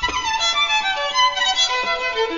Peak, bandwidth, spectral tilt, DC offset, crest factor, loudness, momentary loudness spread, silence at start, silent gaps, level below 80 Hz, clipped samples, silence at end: -6 dBFS; 7.4 kHz; 0 dB/octave; 0.3%; 14 dB; -18 LUFS; 4 LU; 0 s; none; -44 dBFS; under 0.1%; 0 s